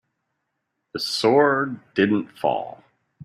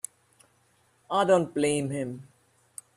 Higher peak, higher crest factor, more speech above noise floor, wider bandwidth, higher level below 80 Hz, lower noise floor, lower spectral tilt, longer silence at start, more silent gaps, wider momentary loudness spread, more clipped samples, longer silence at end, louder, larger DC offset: first, -6 dBFS vs -10 dBFS; about the same, 18 dB vs 20 dB; first, 56 dB vs 41 dB; about the same, 14.5 kHz vs 13.5 kHz; about the same, -66 dBFS vs -68 dBFS; first, -77 dBFS vs -66 dBFS; about the same, -5 dB/octave vs -5 dB/octave; second, 0.95 s vs 1.1 s; neither; second, 12 LU vs 22 LU; neither; second, 0.5 s vs 0.75 s; first, -21 LUFS vs -26 LUFS; neither